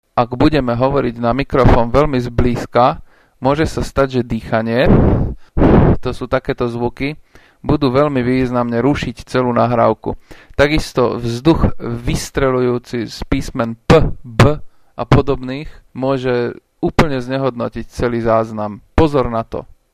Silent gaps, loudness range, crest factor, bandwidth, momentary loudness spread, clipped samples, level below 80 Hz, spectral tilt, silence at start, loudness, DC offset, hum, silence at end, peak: none; 3 LU; 16 dB; 15 kHz; 11 LU; under 0.1%; -26 dBFS; -7 dB/octave; 0.15 s; -16 LUFS; under 0.1%; none; 0.3 s; 0 dBFS